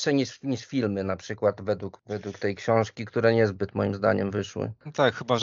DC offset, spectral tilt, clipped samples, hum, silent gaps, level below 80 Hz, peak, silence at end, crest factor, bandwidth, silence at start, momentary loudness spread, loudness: under 0.1%; -5 dB/octave; under 0.1%; none; none; -64 dBFS; -6 dBFS; 0 s; 20 dB; 7.6 kHz; 0 s; 10 LU; -27 LUFS